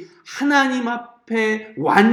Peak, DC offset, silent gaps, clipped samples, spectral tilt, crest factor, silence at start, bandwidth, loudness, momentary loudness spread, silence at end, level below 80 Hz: 0 dBFS; under 0.1%; none; under 0.1%; -5 dB/octave; 18 dB; 0 s; 15 kHz; -20 LUFS; 11 LU; 0 s; -70 dBFS